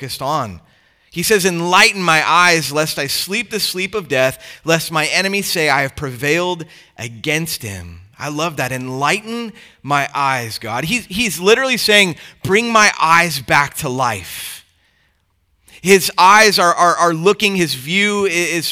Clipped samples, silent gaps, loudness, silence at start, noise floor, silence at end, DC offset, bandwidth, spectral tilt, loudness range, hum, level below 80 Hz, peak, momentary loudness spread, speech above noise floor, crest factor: under 0.1%; none; -14 LUFS; 0 s; -62 dBFS; 0 s; under 0.1%; over 20 kHz; -3 dB/octave; 7 LU; none; -52 dBFS; 0 dBFS; 16 LU; 46 dB; 16 dB